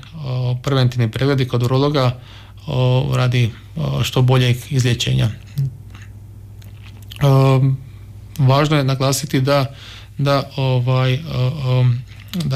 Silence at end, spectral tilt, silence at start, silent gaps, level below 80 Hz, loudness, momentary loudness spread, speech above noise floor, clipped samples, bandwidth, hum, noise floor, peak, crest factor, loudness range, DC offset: 0 s; -6 dB/octave; 0.05 s; none; -42 dBFS; -18 LUFS; 21 LU; 20 dB; under 0.1%; 14.5 kHz; none; -36 dBFS; -6 dBFS; 12 dB; 3 LU; under 0.1%